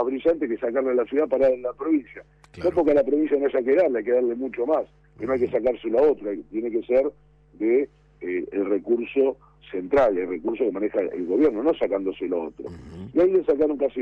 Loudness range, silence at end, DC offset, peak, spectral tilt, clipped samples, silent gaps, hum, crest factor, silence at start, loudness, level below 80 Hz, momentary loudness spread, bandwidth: 3 LU; 0 s; under 0.1%; -12 dBFS; -8 dB/octave; under 0.1%; none; none; 12 dB; 0 s; -23 LUFS; -54 dBFS; 10 LU; 5.8 kHz